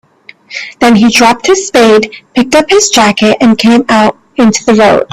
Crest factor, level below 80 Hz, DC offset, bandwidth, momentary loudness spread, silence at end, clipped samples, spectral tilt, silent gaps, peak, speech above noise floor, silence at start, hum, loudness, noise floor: 8 dB; -42 dBFS; under 0.1%; 14.5 kHz; 7 LU; 0.1 s; 0.3%; -3.5 dB/octave; none; 0 dBFS; 30 dB; 0.5 s; none; -7 LUFS; -36 dBFS